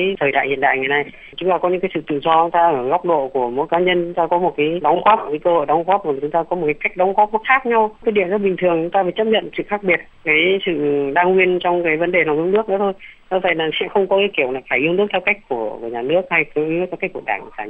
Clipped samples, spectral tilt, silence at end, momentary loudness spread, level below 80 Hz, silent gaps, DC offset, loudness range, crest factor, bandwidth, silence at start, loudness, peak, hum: under 0.1%; -8 dB/octave; 0 s; 6 LU; -52 dBFS; none; under 0.1%; 2 LU; 16 dB; 3.9 kHz; 0 s; -18 LUFS; 0 dBFS; none